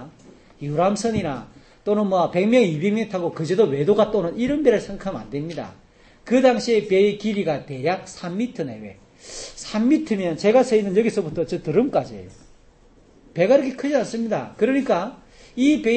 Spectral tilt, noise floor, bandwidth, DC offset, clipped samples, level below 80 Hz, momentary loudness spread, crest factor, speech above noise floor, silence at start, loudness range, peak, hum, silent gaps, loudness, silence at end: -6 dB/octave; -52 dBFS; 8.8 kHz; under 0.1%; under 0.1%; -52 dBFS; 15 LU; 18 dB; 32 dB; 0 s; 3 LU; -4 dBFS; none; none; -21 LUFS; 0 s